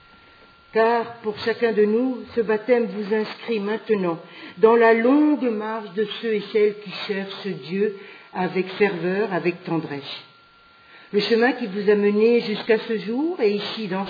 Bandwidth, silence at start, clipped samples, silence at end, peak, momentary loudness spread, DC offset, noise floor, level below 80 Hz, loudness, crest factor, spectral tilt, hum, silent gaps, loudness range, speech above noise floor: 5 kHz; 0.75 s; under 0.1%; 0 s; -4 dBFS; 11 LU; under 0.1%; -52 dBFS; -72 dBFS; -22 LUFS; 18 dB; -7.5 dB/octave; none; none; 5 LU; 31 dB